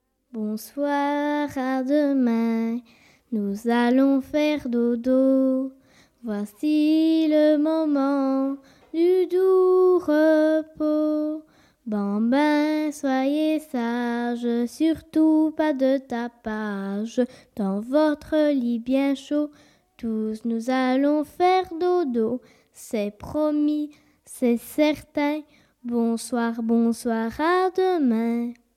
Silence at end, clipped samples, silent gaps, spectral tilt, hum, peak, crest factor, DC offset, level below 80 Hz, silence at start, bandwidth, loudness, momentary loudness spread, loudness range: 0.25 s; under 0.1%; none; -6 dB/octave; none; -10 dBFS; 14 dB; under 0.1%; -60 dBFS; 0.35 s; 14.5 kHz; -23 LUFS; 11 LU; 4 LU